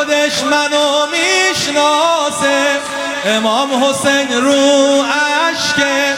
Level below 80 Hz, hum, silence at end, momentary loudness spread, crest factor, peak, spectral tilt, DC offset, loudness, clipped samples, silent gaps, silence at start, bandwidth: -56 dBFS; none; 0 s; 3 LU; 12 dB; -2 dBFS; -2 dB/octave; under 0.1%; -12 LUFS; under 0.1%; none; 0 s; 16.5 kHz